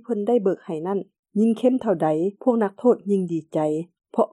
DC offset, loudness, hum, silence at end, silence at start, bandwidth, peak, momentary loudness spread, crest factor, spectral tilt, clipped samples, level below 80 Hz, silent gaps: under 0.1%; -23 LUFS; none; 0.05 s; 0.1 s; 11 kHz; -6 dBFS; 8 LU; 16 dB; -8.5 dB/octave; under 0.1%; -74 dBFS; 1.19-1.23 s